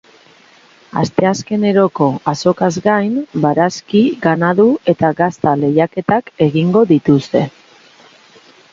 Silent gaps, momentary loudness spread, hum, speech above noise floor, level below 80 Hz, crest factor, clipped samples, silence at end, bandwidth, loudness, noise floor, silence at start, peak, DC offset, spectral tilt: none; 5 LU; none; 33 dB; -54 dBFS; 14 dB; under 0.1%; 1.25 s; 7.6 kHz; -14 LUFS; -46 dBFS; 0.95 s; 0 dBFS; under 0.1%; -7 dB/octave